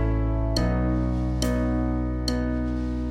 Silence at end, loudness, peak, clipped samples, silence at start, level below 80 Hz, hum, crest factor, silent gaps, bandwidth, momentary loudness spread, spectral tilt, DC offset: 0 s; -26 LUFS; -10 dBFS; under 0.1%; 0 s; -28 dBFS; none; 14 dB; none; 15.5 kHz; 3 LU; -6.5 dB/octave; under 0.1%